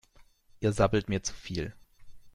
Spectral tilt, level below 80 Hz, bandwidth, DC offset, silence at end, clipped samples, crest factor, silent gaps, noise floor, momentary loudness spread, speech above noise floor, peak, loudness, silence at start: -5.5 dB/octave; -48 dBFS; 12 kHz; under 0.1%; 0.05 s; under 0.1%; 20 dB; none; -59 dBFS; 10 LU; 30 dB; -12 dBFS; -31 LUFS; 0.2 s